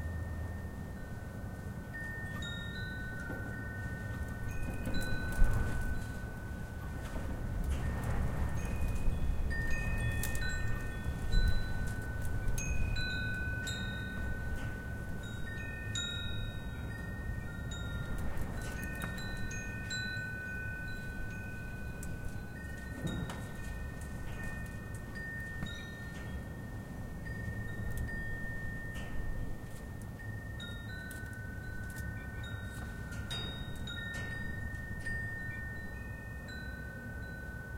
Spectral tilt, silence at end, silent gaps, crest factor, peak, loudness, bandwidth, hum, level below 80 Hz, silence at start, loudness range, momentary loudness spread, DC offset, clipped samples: -5 dB/octave; 0 s; none; 22 dB; -14 dBFS; -40 LUFS; 16.5 kHz; none; -40 dBFS; 0 s; 6 LU; 8 LU; under 0.1%; under 0.1%